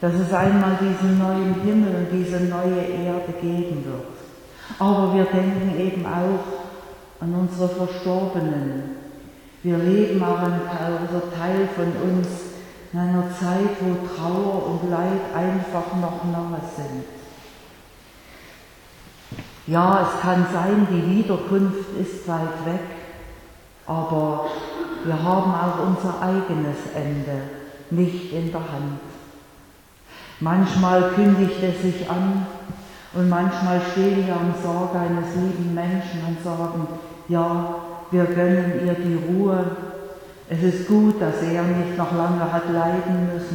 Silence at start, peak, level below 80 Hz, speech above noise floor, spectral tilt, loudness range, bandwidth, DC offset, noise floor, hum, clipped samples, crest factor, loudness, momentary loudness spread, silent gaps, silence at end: 0 s; -4 dBFS; -52 dBFS; 28 dB; -8 dB/octave; 6 LU; 18 kHz; under 0.1%; -49 dBFS; none; under 0.1%; 18 dB; -22 LUFS; 16 LU; none; 0 s